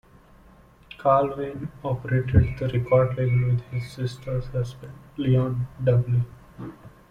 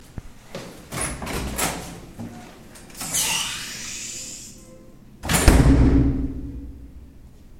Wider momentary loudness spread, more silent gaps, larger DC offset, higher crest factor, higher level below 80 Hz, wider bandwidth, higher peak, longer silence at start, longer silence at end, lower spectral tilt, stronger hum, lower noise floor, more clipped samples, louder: second, 14 LU vs 25 LU; neither; neither; about the same, 20 dB vs 24 dB; second, -42 dBFS vs -28 dBFS; second, 6.8 kHz vs 16.5 kHz; second, -4 dBFS vs 0 dBFS; first, 1 s vs 0.15 s; first, 0.25 s vs 0 s; first, -9 dB/octave vs -4.5 dB/octave; neither; first, -52 dBFS vs -45 dBFS; neither; about the same, -24 LUFS vs -22 LUFS